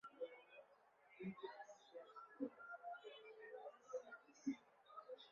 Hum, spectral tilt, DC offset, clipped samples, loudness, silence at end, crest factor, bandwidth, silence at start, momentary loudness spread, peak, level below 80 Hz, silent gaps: none; -4.5 dB/octave; under 0.1%; under 0.1%; -55 LUFS; 0 s; 20 dB; 7.2 kHz; 0.05 s; 11 LU; -34 dBFS; under -90 dBFS; none